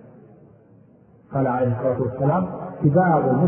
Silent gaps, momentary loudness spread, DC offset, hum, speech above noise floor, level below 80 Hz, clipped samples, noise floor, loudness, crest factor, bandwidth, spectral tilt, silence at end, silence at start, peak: none; 7 LU; under 0.1%; none; 32 dB; -54 dBFS; under 0.1%; -52 dBFS; -21 LUFS; 16 dB; 3.3 kHz; -14 dB/octave; 0 s; 1.3 s; -6 dBFS